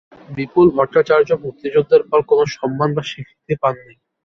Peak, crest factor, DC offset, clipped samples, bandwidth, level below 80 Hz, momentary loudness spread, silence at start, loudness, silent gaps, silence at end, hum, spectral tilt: -2 dBFS; 16 dB; under 0.1%; under 0.1%; 6.6 kHz; -52 dBFS; 14 LU; 0.3 s; -16 LUFS; none; 0.5 s; none; -7 dB/octave